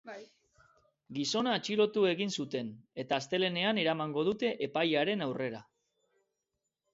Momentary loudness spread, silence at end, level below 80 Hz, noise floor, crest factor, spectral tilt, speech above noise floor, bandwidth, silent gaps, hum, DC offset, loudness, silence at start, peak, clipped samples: 13 LU; 1.3 s; -76 dBFS; -86 dBFS; 18 dB; -4.5 dB/octave; 54 dB; 8 kHz; none; none; under 0.1%; -32 LUFS; 0.05 s; -16 dBFS; under 0.1%